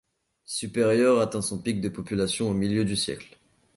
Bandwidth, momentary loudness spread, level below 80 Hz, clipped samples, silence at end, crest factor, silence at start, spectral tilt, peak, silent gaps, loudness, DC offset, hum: 11.5 kHz; 10 LU; -54 dBFS; under 0.1%; 0.5 s; 16 dB; 0.5 s; -5 dB/octave; -10 dBFS; none; -26 LUFS; under 0.1%; none